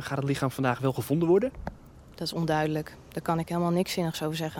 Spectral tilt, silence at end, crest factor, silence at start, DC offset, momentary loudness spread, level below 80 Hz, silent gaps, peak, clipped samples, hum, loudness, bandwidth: -6 dB/octave; 0 s; 18 dB; 0 s; under 0.1%; 11 LU; -52 dBFS; none; -10 dBFS; under 0.1%; none; -28 LUFS; 17.5 kHz